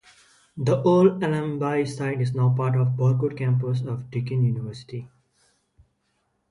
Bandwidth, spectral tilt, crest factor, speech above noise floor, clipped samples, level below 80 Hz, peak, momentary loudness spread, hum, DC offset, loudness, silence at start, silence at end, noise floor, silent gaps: 11 kHz; -8.5 dB/octave; 18 dB; 49 dB; under 0.1%; -62 dBFS; -6 dBFS; 13 LU; none; under 0.1%; -23 LUFS; 0.55 s; 1.45 s; -72 dBFS; none